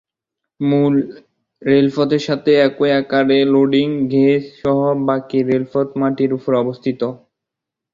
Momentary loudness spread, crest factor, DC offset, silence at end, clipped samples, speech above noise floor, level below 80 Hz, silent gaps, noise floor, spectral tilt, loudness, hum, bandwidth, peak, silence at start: 8 LU; 14 dB; under 0.1%; 0.8 s; under 0.1%; 68 dB; -58 dBFS; none; -83 dBFS; -7.5 dB/octave; -16 LUFS; none; 7.4 kHz; -2 dBFS; 0.6 s